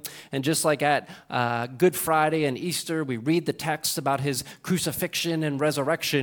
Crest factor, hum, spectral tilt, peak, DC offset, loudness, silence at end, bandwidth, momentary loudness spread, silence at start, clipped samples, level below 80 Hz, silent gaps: 18 dB; none; -4 dB/octave; -8 dBFS; under 0.1%; -25 LUFS; 0 s; 19 kHz; 6 LU; 0.05 s; under 0.1%; -64 dBFS; none